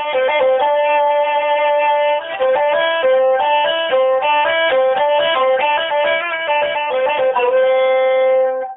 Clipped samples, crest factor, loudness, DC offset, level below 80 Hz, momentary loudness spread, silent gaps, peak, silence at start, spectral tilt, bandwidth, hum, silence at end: under 0.1%; 10 dB; -15 LUFS; under 0.1%; -64 dBFS; 3 LU; none; -4 dBFS; 0 s; 2.5 dB/octave; 3.9 kHz; none; 0 s